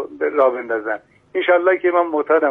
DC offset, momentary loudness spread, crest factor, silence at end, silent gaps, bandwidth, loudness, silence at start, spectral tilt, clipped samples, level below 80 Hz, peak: under 0.1%; 11 LU; 14 dB; 0 s; none; 3.8 kHz; -18 LUFS; 0 s; -6.5 dB/octave; under 0.1%; -68 dBFS; -4 dBFS